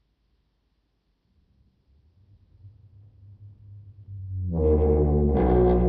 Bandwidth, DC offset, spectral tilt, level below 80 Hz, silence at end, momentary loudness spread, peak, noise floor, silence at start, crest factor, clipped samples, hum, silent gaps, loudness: 3.7 kHz; under 0.1%; -11 dB/octave; -32 dBFS; 0 s; 18 LU; -8 dBFS; -71 dBFS; 2.65 s; 18 dB; under 0.1%; none; none; -23 LUFS